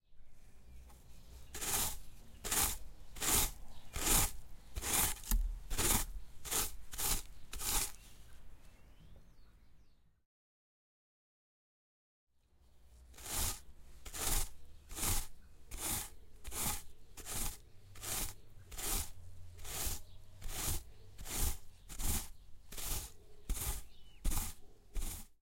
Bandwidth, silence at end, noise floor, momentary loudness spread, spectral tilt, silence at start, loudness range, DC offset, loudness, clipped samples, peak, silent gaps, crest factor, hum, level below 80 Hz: 16.5 kHz; 0.05 s; -65 dBFS; 21 LU; -1.5 dB/octave; 0.1 s; 8 LU; under 0.1%; -38 LUFS; under 0.1%; -14 dBFS; 10.25-12.27 s; 26 dB; none; -46 dBFS